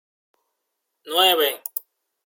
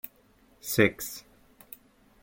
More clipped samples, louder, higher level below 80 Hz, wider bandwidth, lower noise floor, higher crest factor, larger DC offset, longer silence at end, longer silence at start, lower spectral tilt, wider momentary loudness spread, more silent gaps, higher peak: neither; first, -19 LUFS vs -27 LUFS; second, -82 dBFS vs -62 dBFS; about the same, 17 kHz vs 17 kHz; first, -78 dBFS vs -62 dBFS; about the same, 22 dB vs 24 dB; neither; second, 0.45 s vs 1.05 s; first, 1.05 s vs 0.65 s; second, 0 dB/octave vs -4.5 dB/octave; second, 14 LU vs 24 LU; neither; first, -4 dBFS vs -8 dBFS